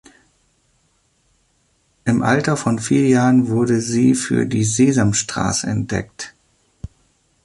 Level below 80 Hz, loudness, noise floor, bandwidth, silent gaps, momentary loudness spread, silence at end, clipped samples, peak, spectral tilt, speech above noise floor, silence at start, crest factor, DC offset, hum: -46 dBFS; -17 LUFS; -62 dBFS; 11.5 kHz; none; 19 LU; 1.15 s; under 0.1%; -2 dBFS; -5 dB/octave; 46 dB; 2.05 s; 16 dB; under 0.1%; none